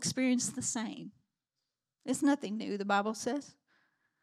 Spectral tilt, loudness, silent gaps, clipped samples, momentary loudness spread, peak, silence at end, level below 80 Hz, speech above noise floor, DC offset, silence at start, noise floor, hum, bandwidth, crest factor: -3.5 dB/octave; -33 LUFS; none; under 0.1%; 13 LU; -16 dBFS; 0.7 s; -80 dBFS; 56 dB; under 0.1%; 0 s; -89 dBFS; none; 14.5 kHz; 18 dB